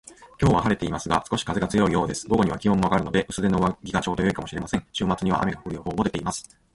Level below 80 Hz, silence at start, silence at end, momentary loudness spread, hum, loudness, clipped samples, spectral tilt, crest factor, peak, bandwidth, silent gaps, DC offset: -42 dBFS; 0.1 s; 0.35 s; 7 LU; none; -24 LUFS; under 0.1%; -5.5 dB/octave; 18 dB; -6 dBFS; 11.5 kHz; none; under 0.1%